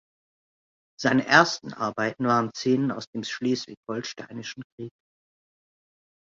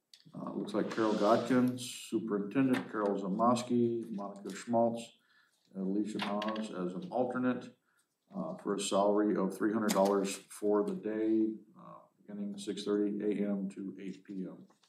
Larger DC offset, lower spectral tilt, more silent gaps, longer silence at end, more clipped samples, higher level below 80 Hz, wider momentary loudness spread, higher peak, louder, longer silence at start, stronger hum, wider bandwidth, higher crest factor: neither; about the same, -4.5 dB/octave vs -5.5 dB/octave; first, 3.07-3.13 s, 3.77-3.83 s, 4.64-4.78 s vs none; first, 1.3 s vs 0.25 s; neither; first, -68 dBFS vs under -90 dBFS; first, 19 LU vs 14 LU; first, -2 dBFS vs -14 dBFS; first, -25 LUFS vs -34 LUFS; first, 1 s vs 0.35 s; neither; second, 7.6 kHz vs 15 kHz; first, 26 dB vs 20 dB